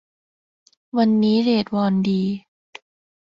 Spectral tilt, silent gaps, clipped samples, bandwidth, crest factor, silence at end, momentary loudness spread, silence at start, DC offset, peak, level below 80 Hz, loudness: -8 dB/octave; none; under 0.1%; 7 kHz; 14 dB; 0.85 s; 9 LU; 0.95 s; under 0.1%; -8 dBFS; -62 dBFS; -20 LUFS